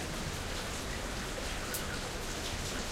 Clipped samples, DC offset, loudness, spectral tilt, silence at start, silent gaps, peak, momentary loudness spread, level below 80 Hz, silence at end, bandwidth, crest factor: under 0.1%; under 0.1%; -37 LUFS; -3 dB/octave; 0 s; none; -18 dBFS; 2 LU; -44 dBFS; 0 s; 16 kHz; 20 dB